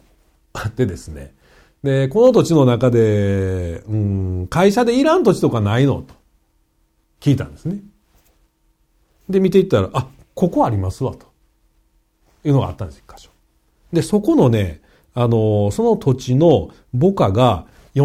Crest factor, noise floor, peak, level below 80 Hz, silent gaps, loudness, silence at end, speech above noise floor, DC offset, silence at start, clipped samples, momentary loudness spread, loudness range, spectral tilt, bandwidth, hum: 16 dB; -62 dBFS; -2 dBFS; -44 dBFS; none; -17 LUFS; 0 s; 46 dB; under 0.1%; 0.55 s; under 0.1%; 13 LU; 7 LU; -7.5 dB/octave; 15 kHz; none